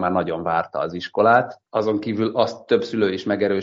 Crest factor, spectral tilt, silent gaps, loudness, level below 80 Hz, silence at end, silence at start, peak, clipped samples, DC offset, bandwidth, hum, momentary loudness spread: 18 dB; -4.5 dB/octave; none; -21 LUFS; -60 dBFS; 0 s; 0 s; -4 dBFS; under 0.1%; under 0.1%; 7.6 kHz; none; 9 LU